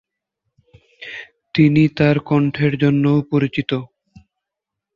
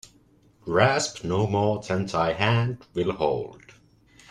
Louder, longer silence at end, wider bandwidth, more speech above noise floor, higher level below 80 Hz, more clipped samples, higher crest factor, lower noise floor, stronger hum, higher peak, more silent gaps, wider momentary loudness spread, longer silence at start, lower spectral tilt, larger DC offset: first, -17 LUFS vs -25 LUFS; first, 1.1 s vs 0.75 s; second, 7 kHz vs 11.5 kHz; first, 67 dB vs 35 dB; about the same, -52 dBFS vs -54 dBFS; neither; second, 16 dB vs 22 dB; first, -83 dBFS vs -59 dBFS; neither; about the same, -2 dBFS vs -4 dBFS; neither; first, 18 LU vs 8 LU; first, 1 s vs 0.65 s; first, -9 dB/octave vs -5.5 dB/octave; neither